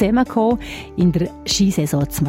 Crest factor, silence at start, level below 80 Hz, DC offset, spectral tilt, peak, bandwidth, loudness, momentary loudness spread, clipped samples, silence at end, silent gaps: 14 dB; 0 s; -36 dBFS; under 0.1%; -5.5 dB/octave; -4 dBFS; 16.5 kHz; -19 LUFS; 6 LU; under 0.1%; 0 s; none